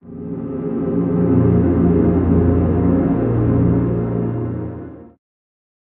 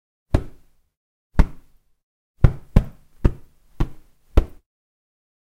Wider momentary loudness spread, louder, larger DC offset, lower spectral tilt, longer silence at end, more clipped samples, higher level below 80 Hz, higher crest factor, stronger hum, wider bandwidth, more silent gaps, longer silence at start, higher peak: second, 13 LU vs 16 LU; first, -17 LUFS vs -24 LUFS; neither; first, -12 dB/octave vs -8.5 dB/octave; second, 0.8 s vs 1.1 s; neither; second, -32 dBFS vs -24 dBFS; second, 14 dB vs 22 dB; neither; second, 3.1 kHz vs 7.8 kHz; second, none vs 0.97-1.30 s, 2.03-2.34 s; second, 0.05 s vs 0.35 s; about the same, -2 dBFS vs 0 dBFS